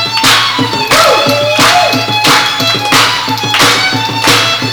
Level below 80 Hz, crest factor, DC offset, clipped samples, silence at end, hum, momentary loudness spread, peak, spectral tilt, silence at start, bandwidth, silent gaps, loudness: -44 dBFS; 10 dB; under 0.1%; 0.2%; 0 s; none; 4 LU; 0 dBFS; -2.5 dB/octave; 0 s; over 20 kHz; none; -7 LUFS